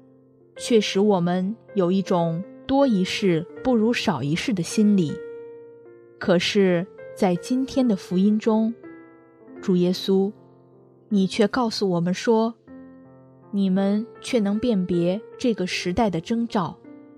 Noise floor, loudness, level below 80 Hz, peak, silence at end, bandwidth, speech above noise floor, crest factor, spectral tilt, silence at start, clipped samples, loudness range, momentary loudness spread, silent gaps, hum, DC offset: -54 dBFS; -23 LUFS; -58 dBFS; -6 dBFS; 0.2 s; 13.5 kHz; 32 dB; 16 dB; -6 dB/octave; 0.55 s; under 0.1%; 2 LU; 8 LU; none; none; under 0.1%